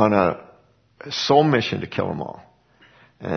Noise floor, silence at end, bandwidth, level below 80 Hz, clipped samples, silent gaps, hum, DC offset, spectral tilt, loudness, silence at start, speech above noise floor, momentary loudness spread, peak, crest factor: -56 dBFS; 0 s; 6.6 kHz; -56 dBFS; under 0.1%; none; 60 Hz at -50 dBFS; under 0.1%; -6 dB/octave; -21 LUFS; 0 s; 36 dB; 19 LU; -2 dBFS; 20 dB